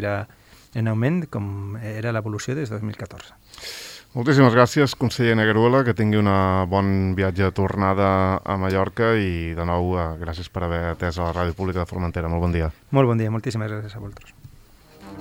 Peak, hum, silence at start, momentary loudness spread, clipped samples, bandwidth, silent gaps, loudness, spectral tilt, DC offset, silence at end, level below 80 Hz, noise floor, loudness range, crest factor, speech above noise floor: 0 dBFS; none; 0 s; 15 LU; under 0.1%; 16.5 kHz; none; -22 LUFS; -7 dB/octave; under 0.1%; 0 s; -44 dBFS; -49 dBFS; 8 LU; 22 dB; 27 dB